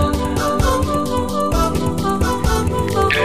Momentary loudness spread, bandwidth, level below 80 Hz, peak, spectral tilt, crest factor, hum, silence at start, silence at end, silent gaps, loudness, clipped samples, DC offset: 2 LU; 15.5 kHz; -24 dBFS; -2 dBFS; -5.5 dB/octave; 16 dB; none; 0 s; 0 s; none; -18 LUFS; under 0.1%; 2%